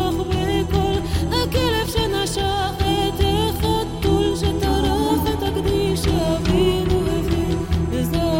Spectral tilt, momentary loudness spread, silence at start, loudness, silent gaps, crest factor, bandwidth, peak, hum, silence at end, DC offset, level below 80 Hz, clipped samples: -5.5 dB/octave; 3 LU; 0 s; -20 LUFS; none; 14 dB; 17 kHz; -6 dBFS; none; 0 s; under 0.1%; -28 dBFS; under 0.1%